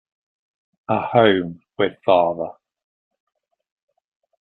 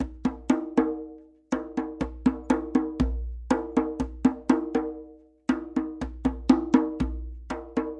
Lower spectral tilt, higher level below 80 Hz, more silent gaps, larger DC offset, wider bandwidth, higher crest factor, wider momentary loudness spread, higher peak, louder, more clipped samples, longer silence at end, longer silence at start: first, -9.5 dB/octave vs -7 dB/octave; second, -62 dBFS vs -40 dBFS; neither; neither; second, 4.3 kHz vs 9.4 kHz; about the same, 22 dB vs 22 dB; first, 16 LU vs 12 LU; about the same, -2 dBFS vs -4 dBFS; first, -19 LUFS vs -28 LUFS; neither; first, 1.9 s vs 0 s; first, 0.9 s vs 0 s